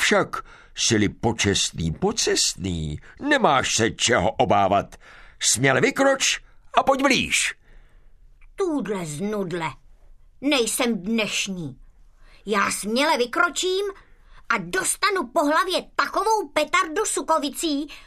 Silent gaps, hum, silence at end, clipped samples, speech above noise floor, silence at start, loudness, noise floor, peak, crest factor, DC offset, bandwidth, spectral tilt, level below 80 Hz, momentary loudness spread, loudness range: none; none; 0.05 s; under 0.1%; 27 dB; 0 s; -22 LUFS; -49 dBFS; -2 dBFS; 20 dB; under 0.1%; 14 kHz; -3 dB/octave; -48 dBFS; 10 LU; 5 LU